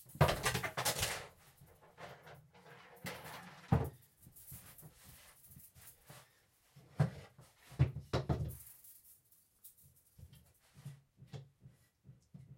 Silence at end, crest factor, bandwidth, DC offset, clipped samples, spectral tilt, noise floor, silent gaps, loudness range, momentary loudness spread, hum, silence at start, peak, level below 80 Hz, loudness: 0.05 s; 28 dB; 16.5 kHz; under 0.1%; under 0.1%; -4.5 dB/octave; -72 dBFS; none; 16 LU; 25 LU; none; 0 s; -14 dBFS; -58 dBFS; -38 LUFS